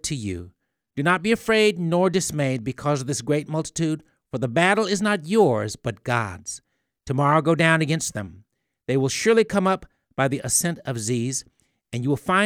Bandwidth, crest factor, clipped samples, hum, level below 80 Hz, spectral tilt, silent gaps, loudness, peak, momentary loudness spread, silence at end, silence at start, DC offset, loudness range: 18.5 kHz; 20 dB; under 0.1%; none; -56 dBFS; -4.5 dB/octave; none; -22 LUFS; -2 dBFS; 14 LU; 0 s; 0.05 s; under 0.1%; 2 LU